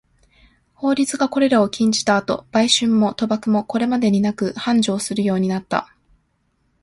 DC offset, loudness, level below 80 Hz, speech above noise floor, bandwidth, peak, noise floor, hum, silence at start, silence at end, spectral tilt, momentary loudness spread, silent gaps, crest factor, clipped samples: under 0.1%; -19 LUFS; -56 dBFS; 48 dB; 11.5 kHz; -2 dBFS; -66 dBFS; none; 0.8 s; 1 s; -4.5 dB/octave; 6 LU; none; 18 dB; under 0.1%